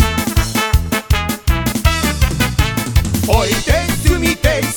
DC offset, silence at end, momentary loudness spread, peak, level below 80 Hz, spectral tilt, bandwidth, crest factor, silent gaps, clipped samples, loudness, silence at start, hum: under 0.1%; 0 s; 3 LU; 0 dBFS; -18 dBFS; -4.5 dB/octave; 19.5 kHz; 14 dB; none; under 0.1%; -15 LUFS; 0 s; none